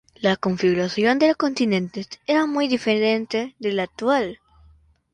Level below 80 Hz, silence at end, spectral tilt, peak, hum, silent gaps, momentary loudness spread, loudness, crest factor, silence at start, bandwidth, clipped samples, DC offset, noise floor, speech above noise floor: -60 dBFS; 0.8 s; -5.5 dB/octave; -6 dBFS; none; none; 7 LU; -22 LUFS; 16 dB; 0.2 s; 10.5 kHz; under 0.1%; under 0.1%; -55 dBFS; 34 dB